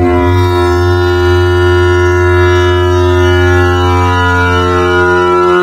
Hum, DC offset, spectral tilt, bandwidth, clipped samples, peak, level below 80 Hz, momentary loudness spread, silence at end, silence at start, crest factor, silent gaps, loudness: none; under 0.1%; -6.5 dB/octave; 13 kHz; under 0.1%; 0 dBFS; -24 dBFS; 2 LU; 0 s; 0 s; 8 dB; none; -9 LUFS